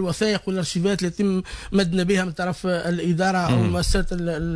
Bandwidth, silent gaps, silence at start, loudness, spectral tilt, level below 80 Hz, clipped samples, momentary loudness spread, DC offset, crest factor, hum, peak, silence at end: 11 kHz; none; 0 s; -23 LUFS; -5.5 dB/octave; -34 dBFS; under 0.1%; 5 LU; under 0.1%; 12 dB; none; -10 dBFS; 0 s